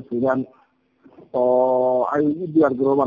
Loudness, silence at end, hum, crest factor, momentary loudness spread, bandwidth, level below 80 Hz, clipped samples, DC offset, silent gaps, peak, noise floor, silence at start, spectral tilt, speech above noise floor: -20 LUFS; 0 s; none; 14 dB; 8 LU; 7 kHz; -60 dBFS; under 0.1%; under 0.1%; none; -6 dBFS; -56 dBFS; 0 s; -10 dB/octave; 37 dB